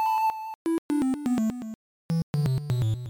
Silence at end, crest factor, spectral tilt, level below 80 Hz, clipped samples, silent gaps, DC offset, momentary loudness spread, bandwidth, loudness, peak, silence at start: 0 s; 10 dB; -7.5 dB/octave; -52 dBFS; under 0.1%; 0.55-0.65 s, 0.78-0.89 s, 1.75-2.09 s, 2.23-2.34 s; under 0.1%; 9 LU; 19 kHz; -28 LUFS; -16 dBFS; 0 s